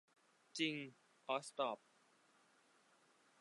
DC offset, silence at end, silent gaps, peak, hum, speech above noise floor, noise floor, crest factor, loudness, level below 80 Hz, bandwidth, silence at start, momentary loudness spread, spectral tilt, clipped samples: under 0.1%; 1.65 s; none; -26 dBFS; none; 31 dB; -74 dBFS; 24 dB; -44 LUFS; under -90 dBFS; 11 kHz; 0.55 s; 14 LU; -3.5 dB/octave; under 0.1%